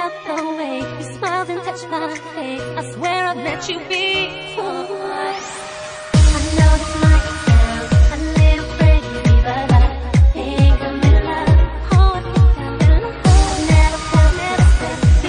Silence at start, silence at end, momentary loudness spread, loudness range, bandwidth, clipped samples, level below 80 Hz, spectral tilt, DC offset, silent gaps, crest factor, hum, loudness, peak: 0 s; 0 s; 11 LU; 7 LU; 10.5 kHz; under 0.1%; -18 dBFS; -6 dB/octave; under 0.1%; none; 14 dB; none; -16 LUFS; 0 dBFS